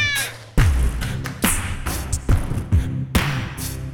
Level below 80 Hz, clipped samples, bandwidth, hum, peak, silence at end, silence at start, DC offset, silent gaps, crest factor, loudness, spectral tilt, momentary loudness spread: -24 dBFS; under 0.1%; 19 kHz; none; -2 dBFS; 0 s; 0 s; under 0.1%; none; 18 dB; -22 LUFS; -4 dB/octave; 7 LU